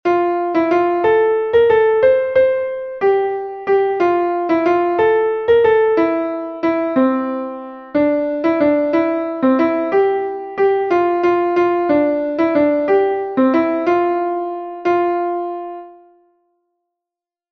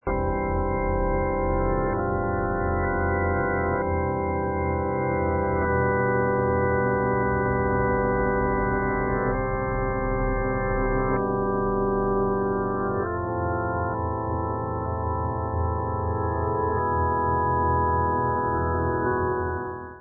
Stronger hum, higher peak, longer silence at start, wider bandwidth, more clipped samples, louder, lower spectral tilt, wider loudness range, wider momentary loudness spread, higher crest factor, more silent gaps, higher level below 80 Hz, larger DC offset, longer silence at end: neither; first, -2 dBFS vs -12 dBFS; about the same, 0.05 s vs 0.05 s; first, 6.2 kHz vs 2.4 kHz; neither; first, -16 LUFS vs -25 LUFS; second, -7.5 dB/octave vs -14.5 dB/octave; about the same, 3 LU vs 3 LU; first, 9 LU vs 4 LU; about the same, 14 dB vs 12 dB; neither; second, -54 dBFS vs -34 dBFS; neither; first, 1.6 s vs 0 s